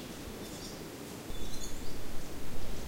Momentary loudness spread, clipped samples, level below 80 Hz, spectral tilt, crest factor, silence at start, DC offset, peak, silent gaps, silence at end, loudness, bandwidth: 2 LU; under 0.1%; -44 dBFS; -4 dB/octave; 12 dB; 0 s; under 0.1%; -20 dBFS; none; 0 s; -43 LUFS; 16 kHz